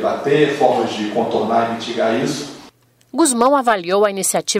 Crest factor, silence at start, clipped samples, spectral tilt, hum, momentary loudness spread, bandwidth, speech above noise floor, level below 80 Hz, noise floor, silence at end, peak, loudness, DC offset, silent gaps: 16 dB; 0 s; under 0.1%; -3.5 dB/octave; none; 8 LU; 16 kHz; 31 dB; -60 dBFS; -48 dBFS; 0 s; 0 dBFS; -17 LUFS; under 0.1%; none